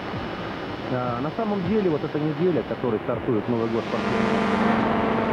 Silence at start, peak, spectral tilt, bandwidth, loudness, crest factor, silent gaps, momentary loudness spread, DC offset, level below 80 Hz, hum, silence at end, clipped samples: 0 s; -8 dBFS; -7.5 dB/octave; 10 kHz; -24 LUFS; 16 dB; none; 9 LU; under 0.1%; -48 dBFS; none; 0 s; under 0.1%